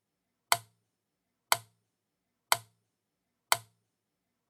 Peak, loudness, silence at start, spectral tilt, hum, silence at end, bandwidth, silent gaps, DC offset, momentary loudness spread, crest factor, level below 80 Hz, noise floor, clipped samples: -4 dBFS; -31 LUFS; 0.5 s; 0.5 dB/octave; none; 0.9 s; 19.5 kHz; none; under 0.1%; 0 LU; 34 dB; -86 dBFS; -84 dBFS; under 0.1%